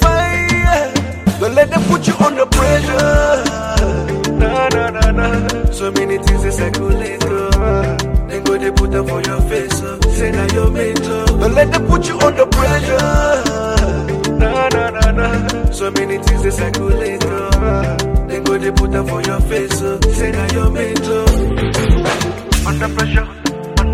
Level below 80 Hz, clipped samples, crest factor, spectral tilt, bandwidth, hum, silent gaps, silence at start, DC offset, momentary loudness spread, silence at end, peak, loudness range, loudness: -18 dBFS; under 0.1%; 14 dB; -5.5 dB/octave; 16 kHz; none; none; 0 s; under 0.1%; 5 LU; 0 s; 0 dBFS; 3 LU; -15 LUFS